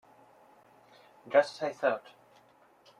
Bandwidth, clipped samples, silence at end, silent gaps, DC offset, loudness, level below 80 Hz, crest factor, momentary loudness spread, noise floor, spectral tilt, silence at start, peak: 10.5 kHz; under 0.1%; 1 s; none; under 0.1%; -30 LUFS; -84 dBFS; 24 dB; 8 LU; -62 dBFS; -4 dB/octave; 1.25 s; -10 dBFS